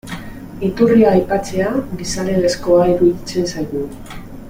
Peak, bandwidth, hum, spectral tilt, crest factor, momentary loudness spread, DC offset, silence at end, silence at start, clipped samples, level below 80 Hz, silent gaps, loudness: 0 dBFS; 16.5 kHz; none; -6 dB/octave; 16 dB; 18 LU; under 0.1%; 0 s; 0.05 s; under 0.1%; -36 dBFS; none; -16 LUFS